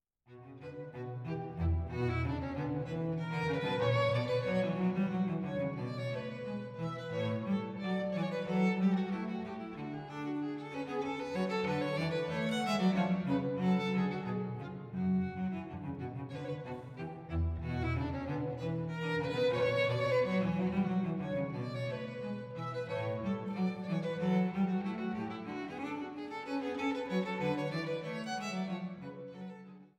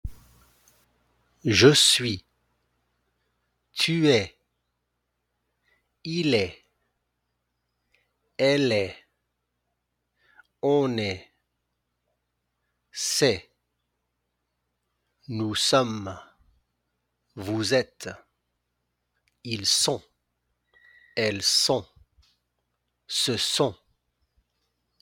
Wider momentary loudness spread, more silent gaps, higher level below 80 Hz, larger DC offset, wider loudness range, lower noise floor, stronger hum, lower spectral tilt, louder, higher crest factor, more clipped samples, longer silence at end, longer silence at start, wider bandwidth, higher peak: second, 11 LU vs 19 LU; neither; about the same, -54 dBFS vs -56 dBFS; neither; second, 5 LU vs 8 LU; second, -56 dBFS vs -79 dBFS; second, none vs 60 Hz at -65 dBFS; first, -7.5 dB/octave vs -3.5 dB/octave; second, -35 LUFS vs -23 LUFS; second, 16 dB vs 24 dB; neither; second, 0.1 s vs 1.25 s; first, 0.3 s vs 0.05 s; second, 9.4 kHz vs 18 kHz; second, -18 dBFS vs -4 dBFS